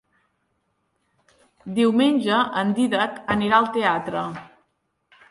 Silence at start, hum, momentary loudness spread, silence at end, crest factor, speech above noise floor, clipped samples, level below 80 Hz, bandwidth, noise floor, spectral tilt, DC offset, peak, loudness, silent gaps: 1.65 s; none; 11 LU; 0.85 s; 20 dB; 51 dB; under 0.1%; -60 dBFS; 11.5 kHz; -71 dBFS; -5.5 dB/octave; under 0.1%; -4 dBFS; -21 LUFS; none